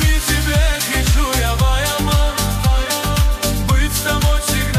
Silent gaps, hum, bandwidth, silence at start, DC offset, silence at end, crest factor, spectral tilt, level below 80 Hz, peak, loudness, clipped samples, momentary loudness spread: none; none; 15.5 kHz; 0 s; under 0.1%; 0 s; 12 dB; -4 dB/octave; -18 dBFS; -4 dBFS; -17 LUFS; under 0.1%; 2 LU